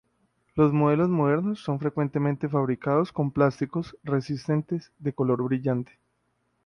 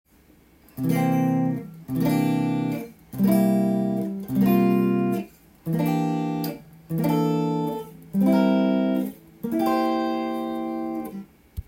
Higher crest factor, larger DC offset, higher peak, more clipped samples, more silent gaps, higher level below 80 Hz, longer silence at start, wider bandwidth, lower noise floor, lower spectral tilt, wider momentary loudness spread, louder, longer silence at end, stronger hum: about the same, 18 dB vs 14 dB; neither; about the same, -8 dBFS vs -8 dBFS; neither; neither; about the same, -60 dBFS vs -56 dBFS; second, 0.55 s vs 0.75 s; second, 9.8 kHz vs 17 kHz; first, -73 dBFS vs -55 dBFS; about the same, -9 dB/octave vs -8 dB/octave; second, 9 LU vs 13 LU; about the same, -26 LUFS vs -24 LUFS; first, 0.8 s vs 0.05 s; neither